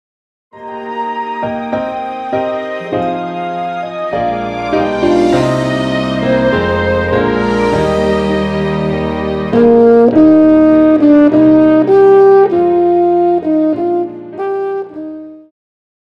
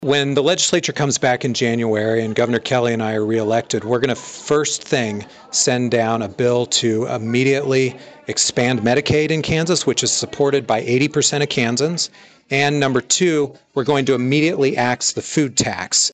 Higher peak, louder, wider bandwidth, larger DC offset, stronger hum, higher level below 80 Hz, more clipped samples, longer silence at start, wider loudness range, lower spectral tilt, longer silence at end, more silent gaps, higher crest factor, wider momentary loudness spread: first, 0 dBFS vs -4 dBFS; first, -12 LUFS vs -18 LUFS; about the same, 9 kHz vs 9.4 kHz; neither; neither; first, -38 dBFS vs -54 dBFS; neither; first, 0.55 s vs 0 s; first, 11 LU vs 2 LU; first, -7.5 dB/octave vs -3.5 dB/octave; first, 0.65 s vs 0 s; neither; about the same, 12 dB vs 14 dB; first, 13 LU vs 5 LU